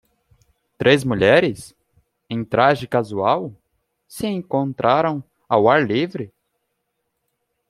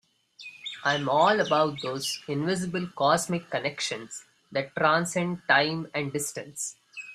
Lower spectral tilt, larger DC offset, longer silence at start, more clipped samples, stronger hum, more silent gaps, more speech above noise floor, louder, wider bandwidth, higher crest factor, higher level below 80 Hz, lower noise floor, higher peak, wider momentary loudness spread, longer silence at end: first, -6 dB/octave vs -3.5 dB/octave; neither; first, 0.8 s vs 0.4 s; neither; neither; neither; first, 56 dB vs 22 dB; first, -19 LUFS vs -27 LUFS; about the same, 14 kHz vs 14.5 kHz; about the same, 20 dB vs 22 dB; first, -56 dBFS vs -68 dBFS; first, -75 dBFS vs -49 dBFS; first, -2 dBFS vs -6 dBFS; about the same, 16 LU vs 14 LU; first, 1.45 s vs 0 s